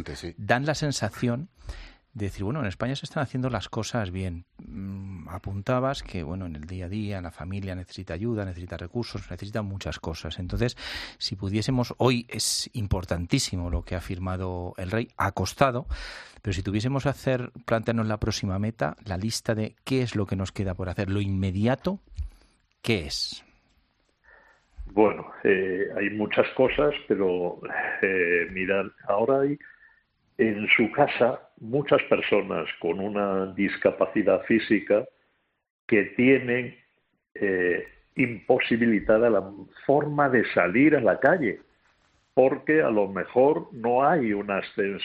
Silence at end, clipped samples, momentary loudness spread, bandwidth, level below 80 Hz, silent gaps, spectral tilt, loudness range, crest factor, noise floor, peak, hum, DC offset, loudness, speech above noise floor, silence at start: 0 s; under 0.1%; 14 LU; 14 kHz; -48 dBFS; 35.70-35.88 s; -5.5 dB/octave; 9 LU; 22 dB; -71 dBFS; -4 dBFS; none; under 0.1%; -26 LUFS; 46 dB; 0 s